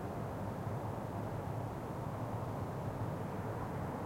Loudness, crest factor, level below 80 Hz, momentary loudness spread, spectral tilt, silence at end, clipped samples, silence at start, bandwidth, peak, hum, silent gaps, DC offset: -41 LUFS; 12 dB; -58 dBFS; 1 LU; -8 dB/octave; 0 s; under 0.1%; 0 s; 16.5 kHz; -28 dBFS; none; none; under 0.1%